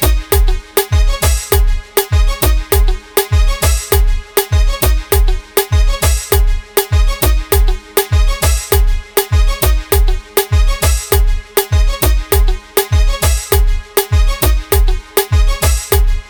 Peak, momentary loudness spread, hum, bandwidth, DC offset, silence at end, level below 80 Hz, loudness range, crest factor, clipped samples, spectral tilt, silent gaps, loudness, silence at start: 0 dBFS; 3 LU; none; over 20 kHz; under 0.1%; 0.05 s; -12 dBFS; 0 LU; 12 dB; under 0.1%; -4 dB/octave; none; -14 LUFS; 0 s